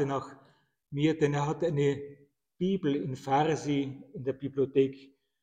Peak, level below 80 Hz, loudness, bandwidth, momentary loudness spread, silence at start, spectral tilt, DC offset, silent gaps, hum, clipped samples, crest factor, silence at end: -14 dBFS; -64 dBFS; -30 LUFS; 9.2 kHz; 11 LU; 0 s; -7 dB/octave; under 0.1%; none; none; under 0.1%; 18 dB; 0.4 s